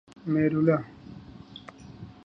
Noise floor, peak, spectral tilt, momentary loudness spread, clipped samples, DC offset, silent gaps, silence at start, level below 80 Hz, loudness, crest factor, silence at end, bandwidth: -46 dBFS; -10 dBFS; -9.5 dB/octave; 23 LU; under 0.1%; under 0.1%; none; 0.25 s; -60 dBFS; -25 LUFS; 18 dB; 0.15 s; 6.2 kHz